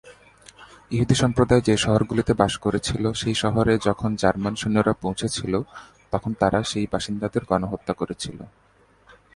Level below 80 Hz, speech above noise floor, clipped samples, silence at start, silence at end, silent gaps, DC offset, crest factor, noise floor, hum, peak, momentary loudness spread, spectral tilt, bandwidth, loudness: -44 dBFS; 33 dB; under 0.1%; 0.05 s; 0.85 s; none; under 0.1%; 22 dB; -56 dBFS; none; -2 dBFS; 9 LU; -5.5 dB/octave; 11.5 kHz; -23 LUFS